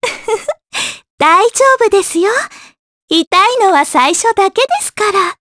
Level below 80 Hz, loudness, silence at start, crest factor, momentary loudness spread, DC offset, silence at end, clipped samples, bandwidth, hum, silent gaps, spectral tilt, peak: -54 dBFS; -11 LUFS; 0 s; 12 dB; 10 LU; under 0.1%; 0.1 s; under 0.1%; 11 kHz; none; 1.10-1.18 s, 2.79-3.08 s, 3.27-3.31 s; -1 dB/octave; 0 dBFS